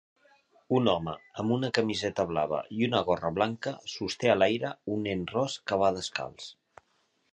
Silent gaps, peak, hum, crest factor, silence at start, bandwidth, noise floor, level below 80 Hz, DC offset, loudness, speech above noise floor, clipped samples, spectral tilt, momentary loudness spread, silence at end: none; -8 dBFS; none; 22 dB; 0.7 s; 10 kHz; -72 dBFS; -60 dBFS; under 0.1%; -29 LUFS; 43 dB; under 0.1%; -5.5 dB/octave; 10 LU; 0.8 s